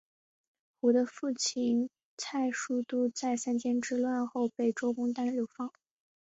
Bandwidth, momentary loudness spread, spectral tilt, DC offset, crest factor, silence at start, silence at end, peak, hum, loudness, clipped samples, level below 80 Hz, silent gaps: 8 kHz; 8 LU; -3.5 dB/octave; under 0.1%; 16 dB; 0.85 s; 0.5 s; -16 dBFS; none; -32 LUFS; under 0.1%; -78 dBFS; 2.05-2.17 s